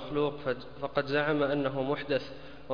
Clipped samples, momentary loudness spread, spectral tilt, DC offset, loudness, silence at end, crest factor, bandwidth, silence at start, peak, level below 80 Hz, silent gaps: under 0.1%; 8 LU; -7.5 dB/octave; 0.5%; -31 LUFS; 0 s; 16 dB; 5.2 kHz; 0 s; -14 dBFS; -58 dBFS; none